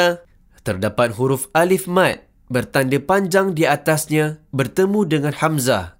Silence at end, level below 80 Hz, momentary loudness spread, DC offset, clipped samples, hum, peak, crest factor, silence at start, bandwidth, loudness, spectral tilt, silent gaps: 0.1 s; -52 dBFS; 7 LU; under 0.1%; under 0.1%; none; -2 dBFS; 16 dB; 0 s; 16 kHz; -18 LUFS; -5 dB/octave; none